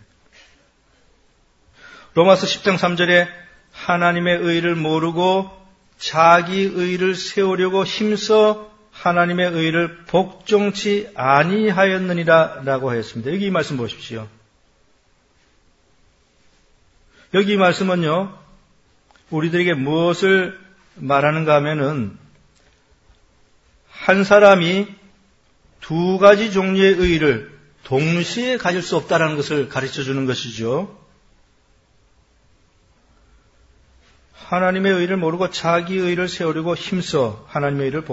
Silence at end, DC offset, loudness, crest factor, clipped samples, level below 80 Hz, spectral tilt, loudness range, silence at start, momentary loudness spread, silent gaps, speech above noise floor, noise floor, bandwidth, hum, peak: 0 s; under 0.1%; -18 LUFS; 20 dB; under 0.1%; -50 dBFS; -5.5 dB/octave; 9 LU; 1.85 s; 10 LU; none; 41 dB; -58 dBFS; 8 kHz; none; 0 dBFS